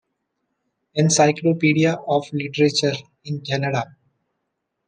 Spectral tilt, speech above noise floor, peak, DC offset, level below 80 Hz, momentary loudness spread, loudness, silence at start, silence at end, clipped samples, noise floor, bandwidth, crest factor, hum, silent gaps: -4.5 dB/octave; 58 dB; -2 dBFS; under 0.1%; -66 dBFS; 14 LU; -20 LUFS; 0.95 s; 1.05 s; under 0.1%; -77 dBFS; 10.5 kHz; 18 dB; none; none